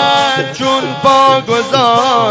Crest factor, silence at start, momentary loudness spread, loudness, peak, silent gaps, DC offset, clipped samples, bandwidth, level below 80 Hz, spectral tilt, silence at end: 10 dB; 0 s; 5 LU; -11 LUFS; 0 dBFS; none; under 0.1%; 0.6%; 8 kHz; -52 dBFS; -4 dB/octave; 0 s